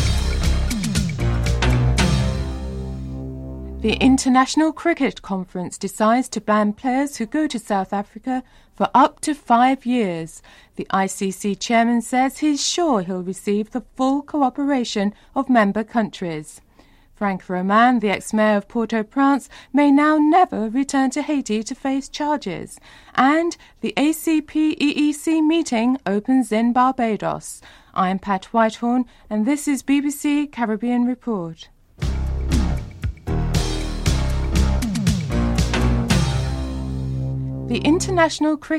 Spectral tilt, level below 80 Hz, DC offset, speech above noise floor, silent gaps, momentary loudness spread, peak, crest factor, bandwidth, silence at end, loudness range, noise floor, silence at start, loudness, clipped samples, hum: -5.5 dB/octave; -30 dBFS; under 0.1%; 32 dB; none; 11 LU; -4 dBFS; 16 dB; 15 kHz; 0 s; 4 LU; -51 dBFS; 0 s; -20 LUFS; under 0.1%; none